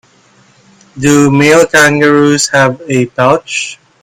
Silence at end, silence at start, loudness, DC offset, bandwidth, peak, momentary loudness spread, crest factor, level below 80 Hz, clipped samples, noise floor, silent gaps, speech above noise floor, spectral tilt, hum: 0.3 s; 0.95 s; -9 LUFS; under 0.1%; 16 kHz; 0 dBFS; 9 LU; 10 dB; -46 dBFS; 0.6%; -46 dBFS; none; 38 dB; -4.5 dB/octave; none